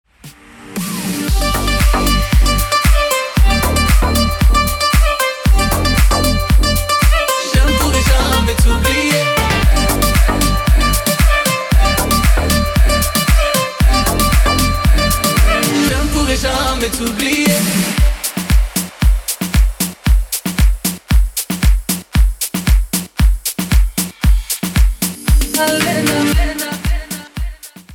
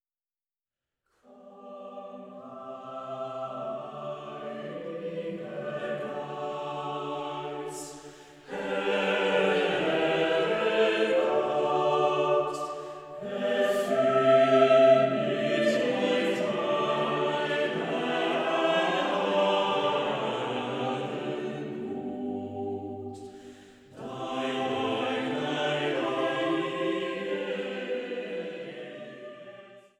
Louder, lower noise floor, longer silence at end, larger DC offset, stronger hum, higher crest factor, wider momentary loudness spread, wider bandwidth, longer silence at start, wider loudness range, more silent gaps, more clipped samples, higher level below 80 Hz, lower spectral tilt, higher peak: first, -14 LUFS vs -28 LUFS; second, -39 dBFS vs under -90 dBFS; second, 0 s vs 0.2 s; neither; neither; second, 12 dB vs 20 dB; second, 6 LU vs 16 LU; first, 18.5 kHz vs 13.5 kHz; second, 0.25 s vs 1.35 s; second, 3 LU vs 13 LU; neither; neither; first, -16 dBFS vs -72 dBFS; about the same, -4 dB/octave vs -5 dB/octave; first, -2 dBFS vs -10 dBFS